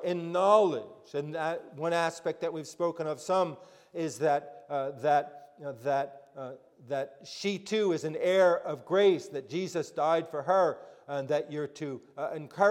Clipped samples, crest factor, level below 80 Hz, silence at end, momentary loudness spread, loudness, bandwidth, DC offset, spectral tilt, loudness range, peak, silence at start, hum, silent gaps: under 0.1%; 20 dB; -82 dBFS; 0 s; 15 LU; -30 LUFS; 14.5 kHz; under 0.1%; -5 dB/octave; 5 LU; -10 dBFS; 0 s; none; none